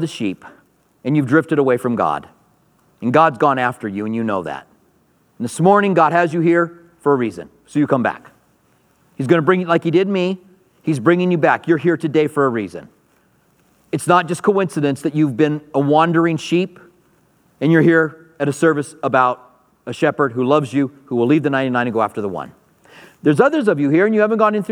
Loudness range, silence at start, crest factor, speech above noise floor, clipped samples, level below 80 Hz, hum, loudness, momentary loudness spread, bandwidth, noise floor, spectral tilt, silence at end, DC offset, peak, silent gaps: 3 LU; 0 s; 18 dB; 42 dB; under 0.1%; -66 dBFS; none; -17 LUFS; 13 LU; 13 kHz; -58 dBFS; -7 dB/octave; 0 s; under 0.1%; 0 dBFS; none